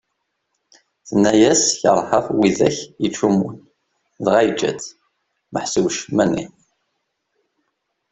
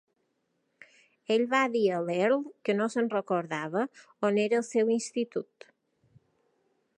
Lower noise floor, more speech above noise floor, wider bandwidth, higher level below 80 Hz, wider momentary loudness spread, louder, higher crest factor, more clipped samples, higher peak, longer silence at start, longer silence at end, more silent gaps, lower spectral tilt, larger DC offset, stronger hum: about the same, -74 dBFS vs -77 dBFS; first, 57 dB vs 48 dB; second, 8.4 kHz vs 11 kHz; first, -56 dBFS vs -84 dBFS; first, 13 LU vs 8 LU; first, -18 LUFS vs -29 LUFS; about the same, 18 dB vs 20 dB; neither; first, -2 dBFS vs -10 dBFS; second, 1.05 s vs 1.3 s; about the same, 1.65 s vs 1.55 s; neither; about the same, -4 dB/octave vs -5 dB/octave; neither; neither